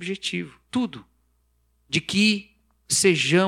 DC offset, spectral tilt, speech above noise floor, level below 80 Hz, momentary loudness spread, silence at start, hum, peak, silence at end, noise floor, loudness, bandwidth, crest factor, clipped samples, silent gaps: under 0.1%; -3.5 dB/octave; 44 dB; -62 dBFS; 13 LU; 0 s; 60 Hz at -55 dBFS; -6 dBFS; 0 s; -66 dBFS; -23 LUFS; 16 kHz; 18 dB; under 0.1%; none